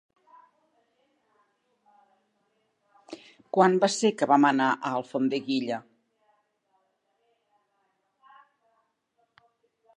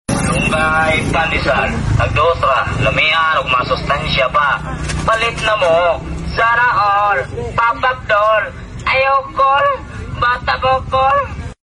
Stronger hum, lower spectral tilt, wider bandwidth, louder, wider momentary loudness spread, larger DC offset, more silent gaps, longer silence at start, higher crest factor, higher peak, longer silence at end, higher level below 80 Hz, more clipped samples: neither; about the same, -4.5 dB/octave vs -4.5 dB/octave; about the same, 11.5 kHz vs 11.5 kHz; second, -25 LUFS vs -14 LUFS; first, 25 LU vs 6 LU; neither; neither; first, 3.1 s vs 0.1 s; first, 24 dB vs 12 dB; second, -6 dBFS vs -2 dBFS; first, 4.15 s vs 0.15 s; second, -84 dBFS vs -30 dBFS; neither